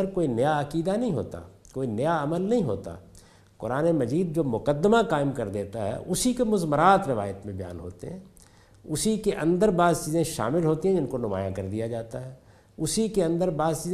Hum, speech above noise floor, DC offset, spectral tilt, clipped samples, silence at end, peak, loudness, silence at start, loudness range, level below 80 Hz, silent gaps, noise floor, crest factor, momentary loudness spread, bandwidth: none; 29 dB; under 0.1%; -6 dB/octave; under 0.1%; 0 s; -6 dBFS; -26 LUFS; 0 s; 4 LU; -50 dBFS; none; -54 dBFS; 20 dB; 16 LU; 15 kHz